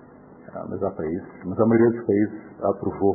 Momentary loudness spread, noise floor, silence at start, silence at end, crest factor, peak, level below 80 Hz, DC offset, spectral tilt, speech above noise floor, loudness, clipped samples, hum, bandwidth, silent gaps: 14 LU; -46 dBFS; 0.3 s; 0 s; 16 dB; -8 dBFS; -52 dBFS; under 0.1%; -15.5 dB/octave; 23 dB; -24 LUFS; under 0.1%; none; 2.2 kHz; none